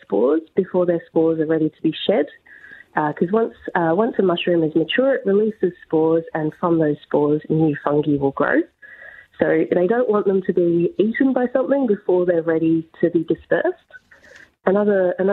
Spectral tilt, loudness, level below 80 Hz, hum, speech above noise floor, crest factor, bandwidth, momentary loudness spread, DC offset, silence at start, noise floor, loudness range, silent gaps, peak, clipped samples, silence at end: -9.5 dB/octave; -19 LUFS; -60 dBFS; none; 29 dB; 18 dB; 4.2 kHz; 4 LU; under 0.1%; 0.1 s; -48 dBFS; 2 LU; none; -2 dBFS; under 0.1%; 0 s